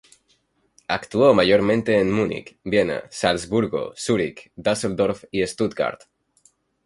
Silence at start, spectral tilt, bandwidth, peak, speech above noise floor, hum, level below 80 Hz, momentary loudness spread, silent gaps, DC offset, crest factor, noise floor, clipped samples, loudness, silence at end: 0.9 s; -5 dB/octave; 11.5 kHz; -2 dBFS; 44 dB; none; -52 dBFS; 10 LU; none; under 0.1%; 20 dB; -65 dBFS; under 0.1%; -22 LUFS; 0.9 s